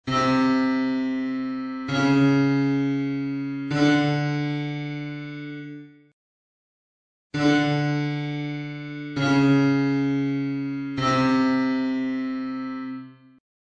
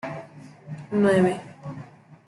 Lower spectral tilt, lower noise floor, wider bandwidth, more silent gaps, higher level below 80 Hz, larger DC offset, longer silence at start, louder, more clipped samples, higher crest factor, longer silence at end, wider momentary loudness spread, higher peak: about the same, -6.5 dB/octave vs -7.5 dB/octave; first, under -90 dBFS vs -44 dBFS; second, 7.8 kHz vs 11.5 kHz; first, 6.13-7.30 s vs none; first, -58 dBFS vs -64 dBFS; neither; about the same, 0.05 s vs 0.05 s; about the same, -24 LUFS vs -22 LUFS; neither; about the same, 16 dB vs 18 dB; first, 0.65 s vs 0.1 s; second, 14 LU vs 23 LU; about the same, -8 dBFS vs -8 dBFS